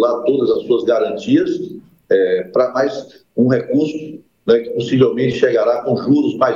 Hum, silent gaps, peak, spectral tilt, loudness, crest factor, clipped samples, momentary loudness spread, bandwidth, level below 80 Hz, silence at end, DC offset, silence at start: none; none; -2 dBFS; -7.5 dB/octave; -16 LUFS; 14 dB; under 0.1%; 10 LU; 7.4 kHz; -60 dBFS; 0 s; under 0.1%; 0 s